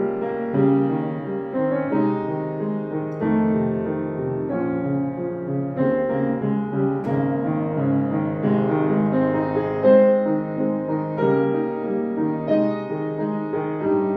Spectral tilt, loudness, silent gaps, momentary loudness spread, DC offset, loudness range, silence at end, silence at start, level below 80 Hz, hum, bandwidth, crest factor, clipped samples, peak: -11.5 dB/octave; -22 LUFS; none; 7 LU; under 0.1%; 4 LU; 0 s; 0 s; -58 dBFS; none; 4.7 kHz; 16 dB; under 0.1%; -4 dBFS